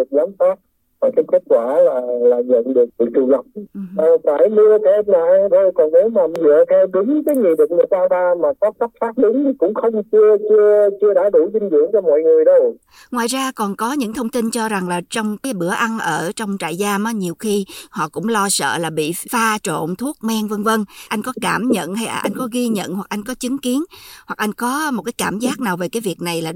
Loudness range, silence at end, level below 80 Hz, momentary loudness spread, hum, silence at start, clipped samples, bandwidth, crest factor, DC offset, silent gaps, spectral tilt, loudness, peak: 8 LU; 0 s; -60 dBFS; 10 LU; none; 0 s; under 0.1%; 17 kHz; 14 dB; under 0.1%; none; -4.5 dB/octave; -17 LUFS; -4 dBFS